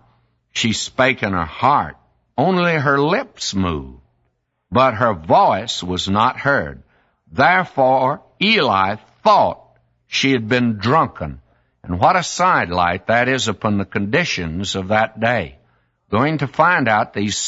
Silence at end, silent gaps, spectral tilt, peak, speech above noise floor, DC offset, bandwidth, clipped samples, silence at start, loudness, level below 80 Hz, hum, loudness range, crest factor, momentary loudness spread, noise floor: 0 s; none; -4.5 dB/octave; 0 dBFS; 51 dB; under 0.1%; 8 kHz; under 0.1%; 0.55 s; -17 LUFS; -46 dBFS; none; 2 LU; 18 dB; 9 LU; -68 dBFS